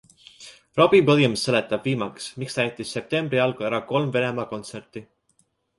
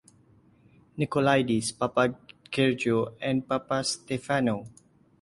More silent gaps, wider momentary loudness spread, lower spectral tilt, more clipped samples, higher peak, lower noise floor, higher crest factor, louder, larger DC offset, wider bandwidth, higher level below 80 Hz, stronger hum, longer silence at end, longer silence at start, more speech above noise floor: neither; first, 20 LU vs 10 LU; about the same, -5.5 dB/octave vs -5 dB/octave; neither; first, -4 dBFS vs -8 dBFS; first, -67 dBFS vs -60 dBFS; about the same, 20 dB vs 20 dB; first, -22 LUFS vs -27 LUFS; neither; about the same, 11.5 kHz vs 11.5 kHz; about the same, -62 dBFS vs -62 dBFS; neither; first, 0.75 s vs 0.55 s; second, 0.4 s vs 0.95 s; first, 45 dB vs 33 dB